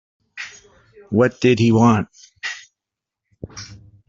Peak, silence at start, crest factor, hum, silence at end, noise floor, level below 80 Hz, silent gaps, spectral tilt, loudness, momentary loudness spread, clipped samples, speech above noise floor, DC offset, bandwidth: -2 dBFS; 0.35 s; 18 dB; none; 0.3 s; -85 dBFS; -52 dBFS; none; -6.5 dB/octave; -18 LUFS; 23 LU; under 0.1%; 69 dB; under 0.1%; 7.6 kHz